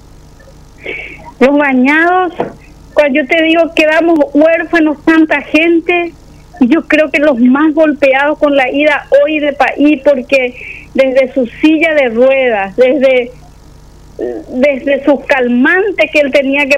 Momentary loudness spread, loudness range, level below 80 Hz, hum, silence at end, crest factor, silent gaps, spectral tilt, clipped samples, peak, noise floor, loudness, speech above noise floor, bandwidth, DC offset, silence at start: 10 LU; 3 LU; -42 dBFS; none; 0 s; 10 dB; none; -5 dB/octave; under 0.1%; 0 dBFS; -36 dBFS; -10 LUFS; 27 dB; 11.5 kHz; under 0.1%; 0.8 s